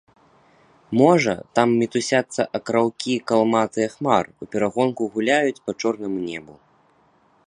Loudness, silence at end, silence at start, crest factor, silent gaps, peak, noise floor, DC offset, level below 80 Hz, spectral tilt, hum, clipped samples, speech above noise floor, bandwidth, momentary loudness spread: -21 LUFS; 0.95 s; 0.9 s; 20 dB; none; -2 dBFS; -59 dBFS; under 0.1%; -62 dBFS; -5 dB/octave; none; under 0.1%; 38 dB; 10.5 kHz; 8 LU